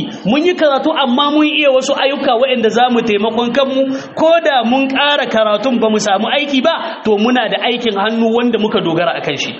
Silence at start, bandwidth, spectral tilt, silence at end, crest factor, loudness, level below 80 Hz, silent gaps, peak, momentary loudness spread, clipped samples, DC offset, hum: 0 s; 8 kHz; -2 dB/octave; 0 s; 12 dB; -13 LUFS; -58 dBFS; none; 0 dBFS; 4 LU; under 0.1%; under 0.1%; none